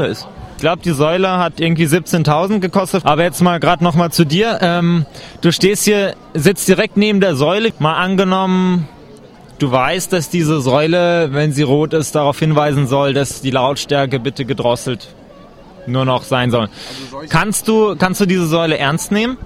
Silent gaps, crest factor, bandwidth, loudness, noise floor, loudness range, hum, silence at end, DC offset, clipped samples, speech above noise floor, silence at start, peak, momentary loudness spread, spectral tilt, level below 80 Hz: none; 14 dB; 16 kHz; -14 LUFS; -39 dBFS; 4 LU; none; 0 s; under 0.1%; under 0.1%; 25 dB; 0 s; 0 dBFS; 7 LU; -5.5 dB/octave; -44 dBFS